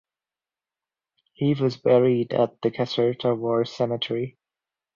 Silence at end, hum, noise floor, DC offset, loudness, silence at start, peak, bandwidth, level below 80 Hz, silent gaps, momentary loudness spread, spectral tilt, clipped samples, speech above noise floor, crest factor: 0.65 s; none; under -90 dBFS; under 0.1%; -23 LUFS; 1.4 s; -6 dBFS; 7.2 kHz; -66 dBFS; none; 8 LU; -7.5 dB/octave; under 0.1%; over 67 dB; 18 dB